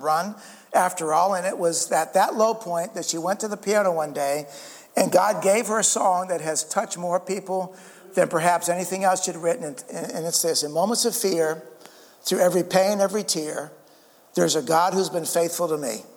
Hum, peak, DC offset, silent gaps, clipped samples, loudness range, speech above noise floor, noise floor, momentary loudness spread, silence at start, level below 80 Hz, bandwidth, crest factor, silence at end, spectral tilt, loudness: none; -4 dBFS; under 0.1%; none; under 0.1%; 2 LU; 31 dB; -54 dBFS; 10 LU; 0 s; -78 dBFS; 19.5 kHz; 20 dB; 0.1 s; -3 dB/octave; -23 LUFS